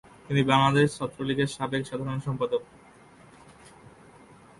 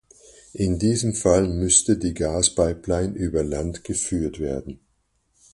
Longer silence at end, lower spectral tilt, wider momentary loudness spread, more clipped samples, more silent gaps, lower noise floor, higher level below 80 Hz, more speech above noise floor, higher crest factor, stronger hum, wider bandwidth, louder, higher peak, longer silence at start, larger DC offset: first, 1.95 s vs 0.8 s; first, -6 dB/octave vs -4.5 dB/octave; about the same, 11 LU vs 12 LU; neither; neither; second, -53 dBFS vs -69 dBFS; second, -58 dBFS vs -38 dBFS; second, 27 dB vs 46 dB; about the same, 22 dB vs 22 dB; neither; about the same, 11.5 kHz vs 11.5 kHz; second, -26 LUFS vs -22 LUFS; second, -6 dBFS vs -2 dBFS; second, 0.3 s vs 0.55 s; neither